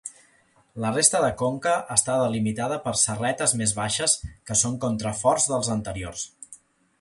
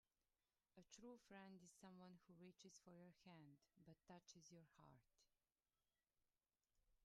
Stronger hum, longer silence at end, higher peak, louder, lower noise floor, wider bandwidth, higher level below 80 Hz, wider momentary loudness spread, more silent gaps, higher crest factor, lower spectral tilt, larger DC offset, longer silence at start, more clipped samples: neither; first, 0.45 s vs 0 s; first, -2 dBFS vs -48 dBFS; first, -23 LUFS vs -67 LUFS; second, -61 dBFS vs under -90 dBFS; about the same, 11.5 kHz vs 11 kHz; first, -50 dBFS vs under -90 dBFS; first, 13 LU vs 4 LU; neither; about the same, 24 dB vs 20 dB; second, -3 dB/octave vs -4.5 dB/octave; neither; second, 0.05 s vs 0.75 s; neither